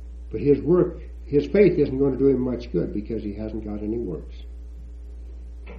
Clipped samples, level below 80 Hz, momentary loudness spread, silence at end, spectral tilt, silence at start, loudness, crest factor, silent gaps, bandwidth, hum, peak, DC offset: under 0.1%; -38 dBFS; 22 LU; 0 s; -10 dB/octave; 0 s; -23 LUFS; 20 dB; none; 6.2 kHz; none; -4 dBFS; under 0.1%